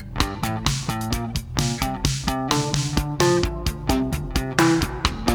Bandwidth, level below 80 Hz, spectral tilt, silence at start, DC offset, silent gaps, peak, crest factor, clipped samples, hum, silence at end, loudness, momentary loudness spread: over 20 kHz; -32 dBFS; -4.5 dB/octave; 0 s; under 0.1%; none; 0 dBFS; 22 dB; under 0.1%; none; 0 s; -23 LUFS; 6 LU